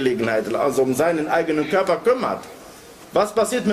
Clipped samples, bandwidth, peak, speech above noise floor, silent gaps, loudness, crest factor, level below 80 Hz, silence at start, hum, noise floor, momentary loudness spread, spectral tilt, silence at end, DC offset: under 0.1%; 15.5 kHz; -6 dBFS; 22 dB; none; -20 LUFS; 14 dB; -56 dBFS; 0 s; none; -42 dBFS; 7 LU; -5 dB/octave; 0 s; under 0.1%